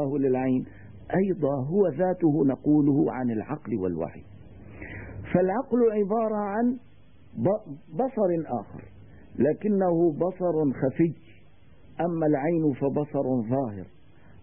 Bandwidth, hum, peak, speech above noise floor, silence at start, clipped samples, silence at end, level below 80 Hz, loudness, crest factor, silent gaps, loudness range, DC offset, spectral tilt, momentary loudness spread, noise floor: 3.3 kHz; none; -8 dBFS; 31 dB; 0 s; under 0.1%; 0.55 s; -56 dBFS; -26 LUFS; 18 dB; none; 3 LU; 0.3%; -13 dB/octave; 16 LU; -56 dBFS